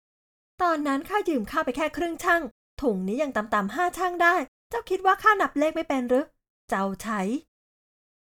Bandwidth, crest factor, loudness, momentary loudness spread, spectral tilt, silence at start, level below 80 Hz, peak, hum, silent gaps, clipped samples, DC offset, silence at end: over 20 kHz; 20 dB; -25 LUFS; 9 LU; -5 dB/octave; 0.6 s; -56 dBFS; -6 dBFS; none; 2.51-2.77 s, 4.48-4.70 s, 6.50-6.68 s; under 0.1%; under 0.1%; 0.95 s